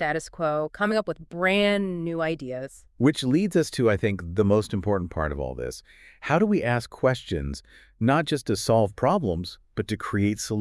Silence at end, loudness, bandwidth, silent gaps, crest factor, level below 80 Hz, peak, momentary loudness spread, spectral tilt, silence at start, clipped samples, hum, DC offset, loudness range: 0 s; -25 LUFS; 12 kHz; none; 16 dB; -46 dBFS; -8 dBFS; 12 LU; -6 dB/octave; 0 s; under 0.1%; none; under 0.1%; 2 LU